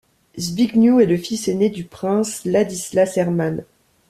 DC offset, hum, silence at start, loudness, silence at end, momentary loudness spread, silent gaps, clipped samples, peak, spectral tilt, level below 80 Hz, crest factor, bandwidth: under 0.1%; none; 0.35 s; -19 LUFS; 0.45 s; 12 LU; none; under 0.1%; -4 dBFS; -5.5 dB/octave; -56 dBFS; 16 dB; 14.5 kHz